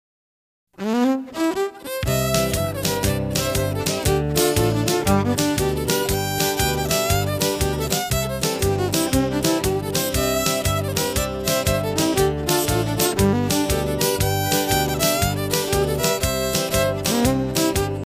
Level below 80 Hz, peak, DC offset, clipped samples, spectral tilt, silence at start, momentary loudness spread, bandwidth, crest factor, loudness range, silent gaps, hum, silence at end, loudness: -34 dBFS; -4 dBFS; under 0.1%; under 0.1%; -4 dB/octave; 0.8 s; 3 LU; 16 kHz; 16 dB; 2 LU; none; none; 0 s; -21 LUFS